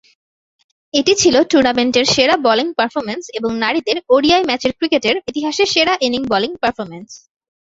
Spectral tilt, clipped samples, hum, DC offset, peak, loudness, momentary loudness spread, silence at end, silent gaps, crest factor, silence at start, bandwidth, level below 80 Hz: -2.5 dB/octave; under 0.1%; none; under 0.1%; 0 dBFS; -15 LUFS; 9 LU; 0.5 s; none; 16 dB; 0.95 s; 8 kHz; -50 dBFS